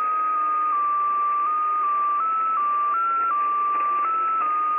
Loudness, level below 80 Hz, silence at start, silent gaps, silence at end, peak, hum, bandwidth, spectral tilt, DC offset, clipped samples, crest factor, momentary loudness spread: -22 LUFS; -78 dBFS; 0 s; none; 0 s; -16 dBFS; none; 3.6 kHz; -5 dB/octave; under 0.1%; under 0.1%; 6 dB; 1 LU